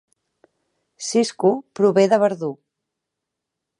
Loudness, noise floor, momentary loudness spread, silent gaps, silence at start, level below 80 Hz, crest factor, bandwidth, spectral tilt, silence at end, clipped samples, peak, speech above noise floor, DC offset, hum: -19 LUFS; -82 dBFS; 13 LU; none; 1 s; -76 dBFS; 18 dB; 11.5 kHz; -5 dB/octave; 1.25 s; under 0.1%; -4 dBFS; 64 dB; under 0.1%; none